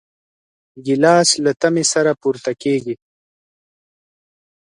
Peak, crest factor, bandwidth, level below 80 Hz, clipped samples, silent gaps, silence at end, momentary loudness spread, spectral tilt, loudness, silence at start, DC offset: 0 dBFS; 18 dB; 11.5 kHz; -64 dBFS; under 0.1%; none; 1.75 s; 14 LU; -3.5 dB/octave; -16 LUFS; 0.75 s; under 0.1%